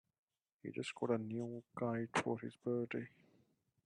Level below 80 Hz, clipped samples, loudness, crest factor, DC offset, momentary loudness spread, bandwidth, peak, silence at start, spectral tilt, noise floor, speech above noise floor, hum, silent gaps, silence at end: -82 dBFS; under 0.1%; -42 LUFS; 20 dB; under 0.1%; 9 LU; 10 kHz; -22 dBFS; 0.65 s; -6 dB/octave; -77 dBFS; 35 dB; none; none; 0.8 s